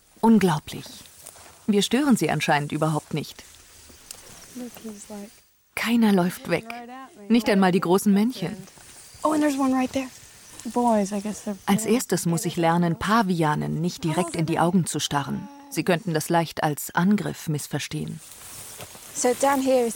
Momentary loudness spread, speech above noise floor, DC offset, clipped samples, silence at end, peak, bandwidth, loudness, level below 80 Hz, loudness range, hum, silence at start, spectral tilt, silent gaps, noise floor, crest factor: 20 LU; 26 dB; under 0.1%; under 0.1%; 0 s; -8 dBFS; 18 kHz; -23 LUFS; -58 dBFS; 4 LU; none; 0.25 s; -5 dB/octave; none; -49 dBFS; 16 dB